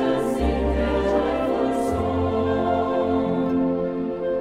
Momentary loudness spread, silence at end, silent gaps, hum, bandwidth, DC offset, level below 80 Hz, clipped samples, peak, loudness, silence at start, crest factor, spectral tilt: 2 LU; 0 s; none; none; 13.5 kHz; under 0.1%; -34 dBFS; under 0.1%; -10 dBFS; -23 LUFS; 0 s; 12 dB; -7.5 dB/octave